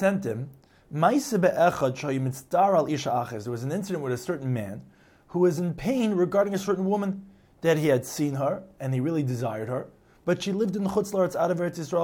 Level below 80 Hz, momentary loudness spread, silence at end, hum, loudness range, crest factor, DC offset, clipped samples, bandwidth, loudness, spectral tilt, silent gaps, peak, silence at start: -60 dBFS; 10 LU; 0 s; none; 3 LU; 18 dB; under 0.1%; under 0.1%; 17.5 kHz; -26 LUFS; -6.5 dB/octave; none; -8 dBFS; 0 s